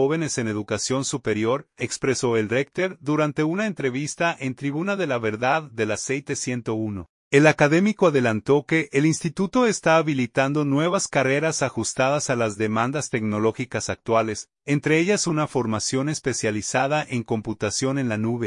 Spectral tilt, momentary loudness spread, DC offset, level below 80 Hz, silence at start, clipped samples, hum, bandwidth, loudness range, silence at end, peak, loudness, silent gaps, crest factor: -5 dB/octave; 7 LU; under 0.1%; -60 dBFS; 0 s; under 0.1%; none; 11 kHz; 4 LU; 0 s; -2 dBFS; -23 LUFS; 7.09-7.31 s; 20 dB